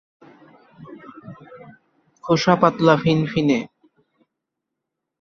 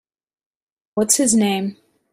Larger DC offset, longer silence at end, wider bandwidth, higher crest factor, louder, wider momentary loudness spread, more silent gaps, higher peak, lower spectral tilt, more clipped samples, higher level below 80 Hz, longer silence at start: neither; first, 1.55 s vs 0.4 s; second, 7.2 kHz vs 15.5 kHz; about the same, 22 dB vs 22 dB; about the same, -18 LUFS vs -17 LUFS; first, 25 LU vs 14 LU; neither; about the same, -2 dBFS vs 0 dBFS; first, -6.5 dB/octave vs -3.5 dB/octave; neither; about the same, -58 dBFS vs -60 dBFS; second, 0.8 s vs 0.95 s